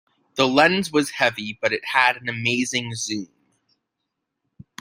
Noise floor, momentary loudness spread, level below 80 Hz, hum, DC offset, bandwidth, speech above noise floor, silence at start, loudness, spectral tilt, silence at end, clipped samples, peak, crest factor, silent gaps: -80 dBFS; 11 LU; -64 dBFS; none; under 0.1%; 16 kHz; 58 dB; 0.35 s; -21 LUFS; -3.5 dB/octave; 1.55 s; under 0.1%; -2 dBFS; 22 dB; none